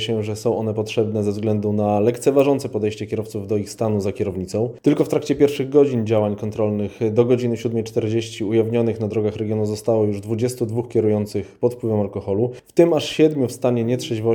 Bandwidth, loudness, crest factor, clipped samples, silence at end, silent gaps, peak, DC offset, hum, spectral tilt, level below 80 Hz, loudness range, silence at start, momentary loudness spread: 19 kHz; -21 LUFS; 18 dB; under 0.1%; 0 s; none; -2 dBFS; under 0.1%; none; -7 dB/octave; -56 dBFS; 2 LU; 0 s; 7 LU